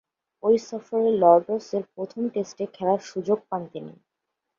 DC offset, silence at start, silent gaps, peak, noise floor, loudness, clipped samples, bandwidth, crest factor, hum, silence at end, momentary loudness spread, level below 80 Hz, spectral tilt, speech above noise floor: under 0.1%; 0.45 s; none; -4 dBFS; -82 dBFS; -24 LUFS; under 0.1%; 7.4 kHz; 22 dB; none; 0.65 s; 15 LU; -72 dBFS; -7 dB/octave; 58 dB